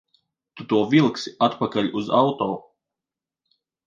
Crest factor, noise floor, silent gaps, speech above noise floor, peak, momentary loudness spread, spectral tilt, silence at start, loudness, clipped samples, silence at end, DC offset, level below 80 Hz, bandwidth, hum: 20 dB; -89 dBFS; none; 68 dB; -4 dBFS; 9 LU; -6.5 dB/octave; 0.55 s; -22 LUFS; under 0.1%; 1.25 s; under 0.1%; -66 dBFS; 7.6 kHz; none